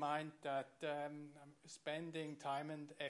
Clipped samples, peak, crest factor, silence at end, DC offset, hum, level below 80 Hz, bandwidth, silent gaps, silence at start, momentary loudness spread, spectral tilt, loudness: under 0.1%; -28 dBFS; 18 dB; 0 s; under 0.1%; none; under -90 dBFS; 11.5 kHz; none; 0 s; 12 LU; -5 dB/octave; -46 LUFS